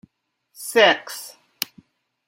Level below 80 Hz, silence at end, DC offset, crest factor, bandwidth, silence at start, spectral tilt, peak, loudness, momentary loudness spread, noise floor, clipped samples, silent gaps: -74 dBFS; 1 s; under 0.1%; 24 dB; 16.5 kHz; 0.6 s; -1.5 dB/octave; 0 dBFS; -20 LUFS; 19 LU; -71 dBFS; under 0.1%; none